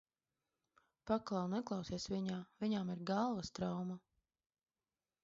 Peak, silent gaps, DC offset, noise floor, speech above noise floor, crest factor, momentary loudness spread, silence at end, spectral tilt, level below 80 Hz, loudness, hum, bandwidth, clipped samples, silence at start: -24 dBFS; none; under 0.1%; under -90 dBFS; over 50 dB; 20 dB; 6 LU; 1.25 s; -6 dB/octave; -70 dBFS; -41 LUFS; none; 7.6 kHz; under 0.1%; 1.05 s